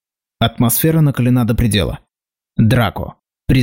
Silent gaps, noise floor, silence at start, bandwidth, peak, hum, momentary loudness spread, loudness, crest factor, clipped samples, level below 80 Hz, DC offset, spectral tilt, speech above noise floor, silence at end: none; -84 dBFS; 0.4 s; 16 kHz; -4 dBFS; none; 15 LU; -15 LUFS; 12 dB; under 0.1%; -32 dBFS; under 0.1%; -5.5 dB/octave; 70 dB; 0 s